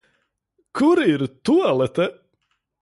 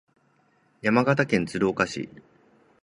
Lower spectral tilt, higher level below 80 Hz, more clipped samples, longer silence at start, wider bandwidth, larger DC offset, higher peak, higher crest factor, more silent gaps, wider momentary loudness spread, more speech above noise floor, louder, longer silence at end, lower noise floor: about the same, -6.5 dB/octave vs -6 dB/octave; about the same, -60 dBFS vs -58 dBFS; neither; about the same, 0.75 s vs 0.85 s; about the same, 11.5 kHz vs 11.5 kHz; neither; about the same, -6 dBFS vs -4 dBFS; second, 14 dB vs 22 dB; neither; second, 8 LU vs 11 LU; first, 53 dB vs 41 dB; first, -20 LUFS vs -24 LUFS; about the same, 0.7 s vs 0.75 s; first, -72 dBFS vs -65 dBFS